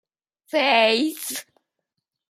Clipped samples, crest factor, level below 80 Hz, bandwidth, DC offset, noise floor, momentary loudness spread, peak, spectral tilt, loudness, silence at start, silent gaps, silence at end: under 0.1%; 20 dB; -80 dBFS; 16 kHz; under 0.1%; -81 dBFS; 13 LU; -6 dBFS; -1.5 dB/octave; -20 LUFS; 0.55 s; none; 0.85 s